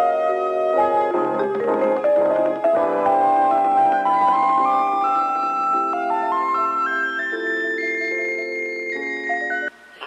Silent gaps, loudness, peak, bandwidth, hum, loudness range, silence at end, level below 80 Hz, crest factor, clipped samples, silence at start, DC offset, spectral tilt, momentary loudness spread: none; -20 LUFS; -8 dBFS; 8.6 kHz; none; 4 LU; 0 s; -66 dBFS; 12 dB; under 0.1%; 0 s; under 0.1%; -5 dB/octave; 7 LU